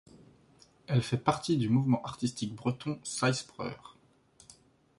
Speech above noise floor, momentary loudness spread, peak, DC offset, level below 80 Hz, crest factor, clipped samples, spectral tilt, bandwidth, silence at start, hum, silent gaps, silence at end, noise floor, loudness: 32 dB; 12 LU; -12 dBFS; under 0.1%; -64 dBFS; 22 dB; under 0.1%; -5.5 dB/octave; 11.5 kHz; 0.9 s; none; none; 1.1 s; -63 dBFS; -31 LUFS